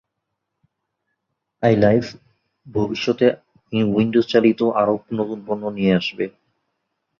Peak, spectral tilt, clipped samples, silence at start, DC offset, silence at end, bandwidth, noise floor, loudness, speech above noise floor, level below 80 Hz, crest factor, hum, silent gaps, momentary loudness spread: -2 dBFS; -7.5 dB/octave; under 0.1%; 1.6 s; under 0.1%; 0.9 s; 7.2 kHz; -78 dBFS; -20 LUFS; 60 dB; -54 dBFS; 18 dB; none; none; 11 LU